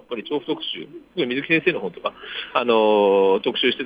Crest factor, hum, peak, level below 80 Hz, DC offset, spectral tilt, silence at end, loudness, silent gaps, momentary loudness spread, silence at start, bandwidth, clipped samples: 16 dB; none; -4 dBFS; -66 dBFS; under 0.1%; -7 dB/octave; 0 s; -21 LUFS; none; 14 LU; 0.1 s; 5 kHz; under 0.1%